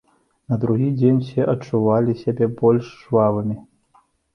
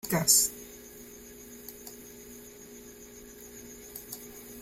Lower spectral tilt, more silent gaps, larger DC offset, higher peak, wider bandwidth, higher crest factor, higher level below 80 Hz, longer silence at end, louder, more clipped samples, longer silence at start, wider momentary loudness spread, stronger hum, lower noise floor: first, -10 dB/octave vs -2 dB/octave; neither; neither; first, -4 dBFS vs -8 dBFS; second, 6.6 kHz vs 16.5 kHz; second, 16 dB vs 26 dB; about the same, -56 dBFS vs -60 dBFS; first, 0.75 s vs 0 s; first, -20 LUFS vs -24 LUFS; neither; first, 0.5 s vs 0.05 s; second, 7 LU vs 25 LU; second, none vs 60 Hz at -55 dBFS; first, -59 dBFS vs -49 dBFS